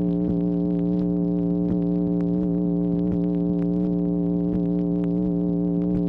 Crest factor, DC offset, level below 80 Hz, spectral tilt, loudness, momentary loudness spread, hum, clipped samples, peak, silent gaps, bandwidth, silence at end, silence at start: 10 dB; under 0.1%; -42 dBFS; -13 dB/octave; -23 LUFS; 0 LU; none; under 0.1%; -12 dBFS; none; 2.1 kHz; 0 s; 0 s